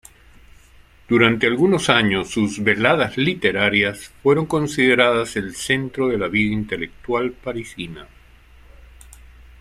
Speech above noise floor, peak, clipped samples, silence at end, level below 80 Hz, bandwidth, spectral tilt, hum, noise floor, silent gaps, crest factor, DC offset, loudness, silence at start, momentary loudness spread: 30 dB; -2 dBFS; under 0.1%; 0.2 s; -48 dBFS; 14.5 kHz; -5 dB/octave; none; -49 dBFS; none; 18 dB; under 0.1%; -19 LUFS; 1.1 s; 12 LU